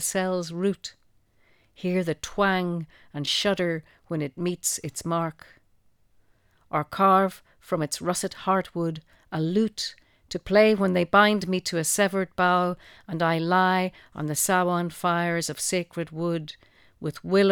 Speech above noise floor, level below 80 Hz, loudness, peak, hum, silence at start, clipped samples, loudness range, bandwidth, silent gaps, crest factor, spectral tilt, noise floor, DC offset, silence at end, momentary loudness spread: 37 dB; -60 dBFS; -25 LUFS; -6 dBFS; none; 0 s; under 0.1%; 6 LU; 19 kHz; none; 20 dB; -4 dB/octave; -62 dBFS; under 0.1%; 0 s; 14 LU